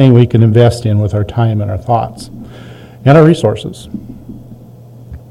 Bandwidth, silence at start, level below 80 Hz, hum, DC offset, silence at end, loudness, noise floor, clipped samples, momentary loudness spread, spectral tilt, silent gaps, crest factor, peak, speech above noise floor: 11.5 kHz; 0 s; -38 dBFS; none; under 0.1%; 0.15 s; -11 LUFS; -35 dBFS; 2%; 25 LU; -8 dB/octave; none; 12 dB; 0 dBFS; 25 dB